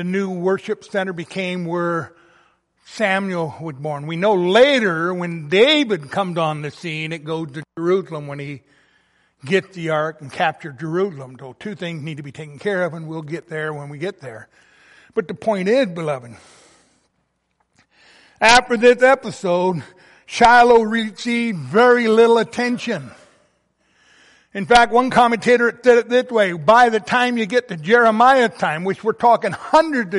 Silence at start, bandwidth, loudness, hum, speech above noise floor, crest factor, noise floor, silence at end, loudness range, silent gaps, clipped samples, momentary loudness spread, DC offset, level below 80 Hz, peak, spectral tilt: 0 s; 11.5 kHz; -17 LUFS; none; 52 dB; 18 dB; -69 dBFS; 0 s; 10 LU; none; under 0.1%; 16 LU; under 0.1%; -52 dBFS; 0 dBFS; -5 dB/octave